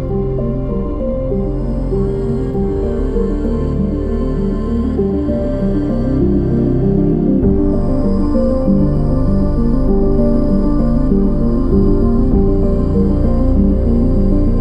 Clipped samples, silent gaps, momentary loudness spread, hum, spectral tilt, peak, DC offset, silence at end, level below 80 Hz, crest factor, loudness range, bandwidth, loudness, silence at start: under 0.1%; none; 5 LU; none; -11 dB/octave; -2 dBFS; under 0.1%; 0 s; -18 dBFS; 12 dB; 4 LU; 5.2 kHz; -16 LUFS; 0 s